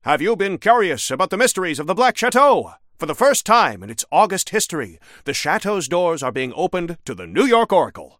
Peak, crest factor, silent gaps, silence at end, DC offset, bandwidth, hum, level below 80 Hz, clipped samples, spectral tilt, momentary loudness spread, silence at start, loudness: 0 dBFS; 18 dB; none; 0.15 s; under 0.1%; 16.5 kHz; none; -56 dBFS; under 0.1%; -3 dB/octave; 12 LU; 0.05 s; -18 LUFS